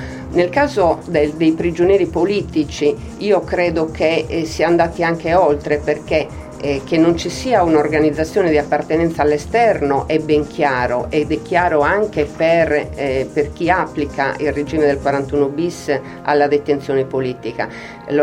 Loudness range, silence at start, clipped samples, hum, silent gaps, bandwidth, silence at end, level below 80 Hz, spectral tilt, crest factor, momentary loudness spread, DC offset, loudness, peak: 2 LU; 0 s; under 0.1%; none; none; 12.5 kHz; 0 s; -38 dBFS; -6 dB/octave; 16 dB; 7 LU; under 0.1%; -17 LUFS; 0 dBFS